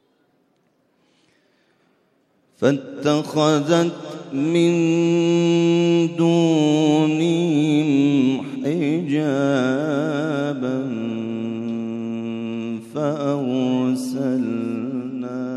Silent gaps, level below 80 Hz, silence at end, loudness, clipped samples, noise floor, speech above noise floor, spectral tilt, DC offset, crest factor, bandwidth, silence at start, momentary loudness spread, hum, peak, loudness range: none; -72 dBFS; 0 s; -20 LUFS; under 0.1%; -64 dBFS; 46 dB; -6.5 dB/octave; under 0.1%; 16 dB; 12 kHz; 2.6 s; 10 LU; none; -4 dBFS; 7 LU